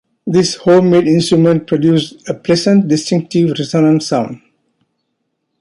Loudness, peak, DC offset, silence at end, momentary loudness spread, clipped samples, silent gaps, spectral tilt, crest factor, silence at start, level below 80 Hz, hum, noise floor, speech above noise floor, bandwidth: -13 LUFS; -2 dBFS; under 0.1%; 1.25 s; 7 LU; under 0.1%; none; -6 dB/octave; 12 dB; 0.25 s; -54 dBFS; none; -70 dBFS; 58 dB; 11.5 kHz